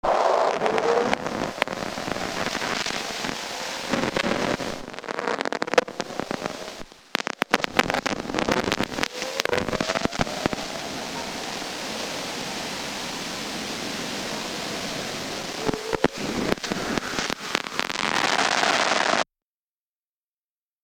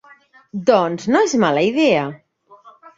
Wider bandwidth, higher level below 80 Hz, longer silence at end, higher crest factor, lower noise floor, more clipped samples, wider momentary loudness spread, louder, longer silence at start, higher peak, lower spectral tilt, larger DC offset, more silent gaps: first, 19.5 kHz vs 7.8 kHz; first, -50 dBFS vs -60 dBFS; first, 1.6 s vs 0.25 s; first, 26 dB vs 18 dB; first, under -90 dBFS vs -49 dBFS; neither; about the same, 9 LU vs 7 LU; second, -26 LUFS vs -17 LUFS; second, 0.05 s vs 0.55 s; about the same, 0 dBFS vs -2 dBFS; second, -3 dB/octave vs -5 dB/octave; neither; neither